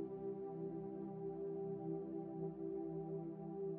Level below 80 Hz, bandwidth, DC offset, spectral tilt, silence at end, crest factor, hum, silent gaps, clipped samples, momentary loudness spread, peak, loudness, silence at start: -74 dBFS; 2.9 kHz; under 0.1%; -12 dB/octave; 0 s; 12 dB; none; none; under 0.1%; 2 LU; -34 dBFS; -46 LUFS; 0 s